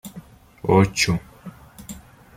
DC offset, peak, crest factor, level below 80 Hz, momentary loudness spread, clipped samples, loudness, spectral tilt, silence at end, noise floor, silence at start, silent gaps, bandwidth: under 0.1%; -2 dBFS; 20 dB; -48 dBFS; 24 LU; under 0.1%; -20 LUFS; -5 dB/octave; 0.4 s; -44 dBFS; 0.05 s; none; 16 kHz